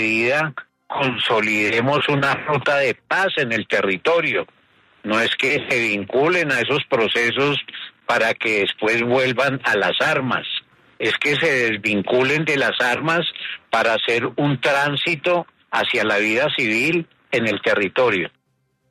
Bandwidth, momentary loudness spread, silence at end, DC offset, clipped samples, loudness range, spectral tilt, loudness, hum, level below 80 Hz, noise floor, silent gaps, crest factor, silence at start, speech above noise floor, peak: 13.5 kHz; 6 LU; 0.6 s; under 0.1%; under 0.1%; 1 LU; -4.5 dB/octave; -19 LUFS; none; -62 dBFS; -68 dBFS; none; 14 dB; 0 s; 49 dB; -6 dBFS